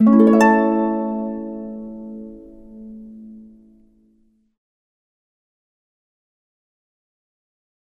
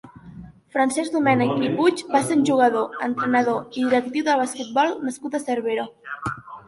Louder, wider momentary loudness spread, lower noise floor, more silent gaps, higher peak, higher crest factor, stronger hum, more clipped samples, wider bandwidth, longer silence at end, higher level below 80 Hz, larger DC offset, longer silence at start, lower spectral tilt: first, -17 LUFS vs -22 LUFS; first, 27 LU vs 10 LU; first, -60 dBFS vs -42 dBFS; neither; about the same, -2 dBFS vs -4 dBFS; about the same, 20 dB vs 18 dB; neither; neither; about the same, 10.5 kHz vs 11.5 kHz; first, 4.6 s vs 0.05 s; about the same, -56 dBFS vs -60 dBFS; neither; about the same, 0 s vs 0.05 s; first, -7.5 dB/octave vs -5 dB/octave